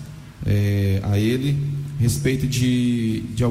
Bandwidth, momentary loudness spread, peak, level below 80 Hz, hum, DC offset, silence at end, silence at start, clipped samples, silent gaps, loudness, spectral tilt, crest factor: 16 kHz; 5 LU; -10 dBFS; -40 dBFS; none; under 0.1%; 0 s; 0 s; under 0.1%; none; -21 LUFS; -6.5 dB/octave; 12 dB